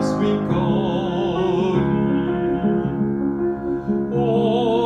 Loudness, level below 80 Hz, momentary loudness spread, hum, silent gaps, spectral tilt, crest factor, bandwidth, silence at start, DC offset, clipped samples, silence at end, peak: -20 LUFS; -42 dBFS; 4 LU; none; none; -8 dB/octave; 14 dB; 9.4 kHz; 0 s; under 0.1%; under 0.1%; 0 s; -6 dBFS